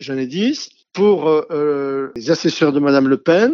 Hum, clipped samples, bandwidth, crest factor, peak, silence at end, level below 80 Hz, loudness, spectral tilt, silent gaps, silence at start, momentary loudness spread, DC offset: none; under 0.1%; 7.4 kHz; 14 dB; -2 dBFS; 0 s; -66 dBFS; -17 LUFS; -5.5 dB/octave; none; 0 s; 9 LU; under 0.1%